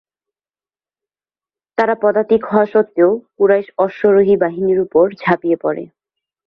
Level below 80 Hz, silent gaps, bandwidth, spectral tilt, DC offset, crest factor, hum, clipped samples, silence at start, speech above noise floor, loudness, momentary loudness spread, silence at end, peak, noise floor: -58 dBFS; none; 5.4 kHz; -9 dB/octave; under 0.1%; 16 dB; 50 Hz at -70 dBFS; under 0.1%; 1.8 s; over 76 dB; -15 LUFS; 6 LU; 0.6 s; 0 dBFS; under -90 dBFS